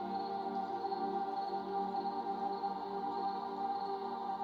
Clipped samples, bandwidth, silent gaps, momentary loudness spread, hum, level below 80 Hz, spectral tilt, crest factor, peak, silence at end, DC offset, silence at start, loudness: under 0.1%; 6.6 kHz; none; 2 LU; none; -78 dBFS; -7 dB/octave; 12 dB; -26 dBFS; 0 s; under 0.1%; 0 s; -39 LUFS